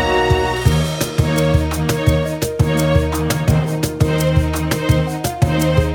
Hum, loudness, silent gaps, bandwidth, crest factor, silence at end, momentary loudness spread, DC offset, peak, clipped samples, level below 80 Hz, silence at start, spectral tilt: none; -17 LUFS; none; over 20 kHz; 16 dB; 0 s; 4 LU; under 0.1%; 0 dBFS; under 0.1%; -26 dBFS; 0 s; -6 dB/octave